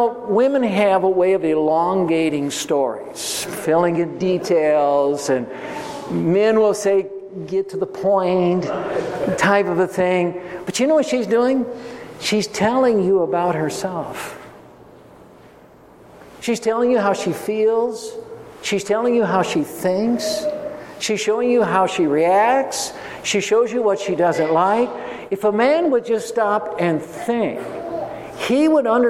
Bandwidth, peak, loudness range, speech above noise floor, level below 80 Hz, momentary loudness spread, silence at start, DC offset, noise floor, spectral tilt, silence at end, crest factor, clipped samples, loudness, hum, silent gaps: 16 kHz; -2 dBFS; 4 LU; 28 dB; -60 dBFS; 12 LU; 0 s; under 0.1%; -46 dBFS; -5 dB/octave; 0 s; 16 dB; under 0.1%; -19 LUFS; none; none